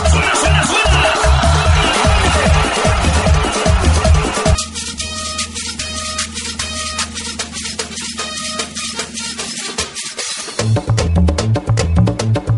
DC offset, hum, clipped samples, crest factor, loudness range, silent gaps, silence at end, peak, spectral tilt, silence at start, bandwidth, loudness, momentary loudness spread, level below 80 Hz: under 0.1%; none; under 0.1%; 14 dB; 8 LU; none; 0 s; 0 dBFS; -4 dB/octave; 0 s; 11.5 kHz; -15 LUFS; 9 LU; -20 dBFS